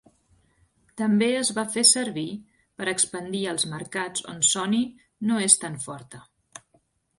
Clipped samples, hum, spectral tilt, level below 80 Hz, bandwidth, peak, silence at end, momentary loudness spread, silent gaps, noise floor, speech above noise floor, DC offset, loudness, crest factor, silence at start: under 0.1%; none; -2.5 dB/octave; -68 dBFS; 11.5 kHz; 0 dBFS; 1 s; 15 LU; none; -67 dBFS; 42 dB; under 0.1%; -23 LUFS; 26 dB; 0.95 s